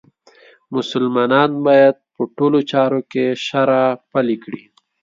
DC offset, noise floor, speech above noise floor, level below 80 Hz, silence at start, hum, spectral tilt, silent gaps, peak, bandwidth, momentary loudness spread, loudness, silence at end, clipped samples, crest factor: under 0.1%; -49 dBFS; 33 dB; -68 dBFS; 0.7 s; none; -6.5 dB/octave; none; 0 dBFS; 7.6 kHz; 13 LU; -17 LUFS; 0.45 s; under 0.1%; 16 dB